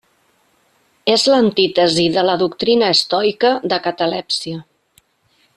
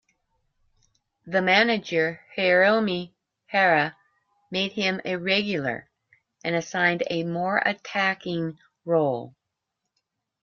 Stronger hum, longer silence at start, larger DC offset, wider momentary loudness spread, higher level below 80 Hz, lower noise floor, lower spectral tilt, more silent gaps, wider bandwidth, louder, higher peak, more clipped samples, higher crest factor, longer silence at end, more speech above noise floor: neither; second, 1.05 s vs 1.25 s; neither; second, 8 LU vs 12 LU; first, -58 dBFS vs -68 dBFS; second, -60 dBFS vs -82 dBFS; about the same, -4 dB/octave vs -5 dB/octave; neither; first, 13 kHz vs 7.2 kHz; first, -15 LUFS vs -24 LUFS; first, -2 dBFS vs -6 dBFS; neither; about the same, 16 dB vs 20 dB; second, 0.95 s vs 1.15 s; second, 44 dB vs 58 dB